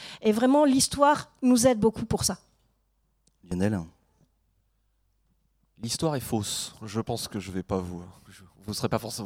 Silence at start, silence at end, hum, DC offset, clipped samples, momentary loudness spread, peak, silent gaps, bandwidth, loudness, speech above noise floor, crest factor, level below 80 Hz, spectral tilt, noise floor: 0 s; 0 s; none; under 0.1%; under 0.1%; 15 LU; -8 dBFS; none; 16.5 kHz; -26 LUFS; 45 dB; 20 dB; -54 dBFS; -4.5 dB/octave; -71 dBFS